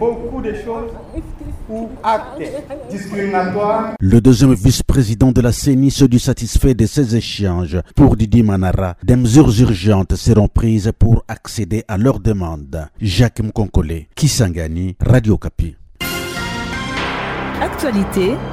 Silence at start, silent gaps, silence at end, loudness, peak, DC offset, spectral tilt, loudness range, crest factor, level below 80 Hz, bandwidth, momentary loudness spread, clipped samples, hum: 0 s; none; 0 s; -15 LUFS; 0 dBFS; under 0.1%; -6.5 dB/octave; 6 LU; 14 dB; -26 dBFS; 16 kHz; 15 LU; under 0.1%; none